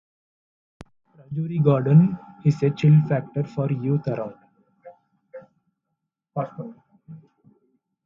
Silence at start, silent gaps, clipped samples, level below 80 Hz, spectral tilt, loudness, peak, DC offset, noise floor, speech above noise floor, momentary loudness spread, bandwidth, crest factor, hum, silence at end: 1.3 s; none; under 0.1%; -62 dBFS; -10 dB/octave; -22 LUFS; -6 dBFS; under 0.1%; -81 dBFS; 60 dB; 17 LU; 6.8 kHz; 18 dB; none; 0.9 s